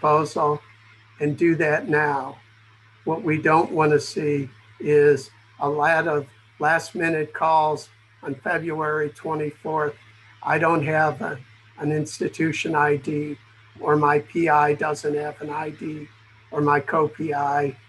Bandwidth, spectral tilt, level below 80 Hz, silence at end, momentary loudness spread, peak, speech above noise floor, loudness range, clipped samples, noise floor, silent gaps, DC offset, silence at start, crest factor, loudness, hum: 12 kHz; -6 dB/octave; -64 dBFS; 0.15 s; 13 LU; -6 dBFS; 31 dB; 3 LU; under 0.1%; -53 dBFS; none; under 0.1%; 0 s; 16 dB; -22 LUFS; none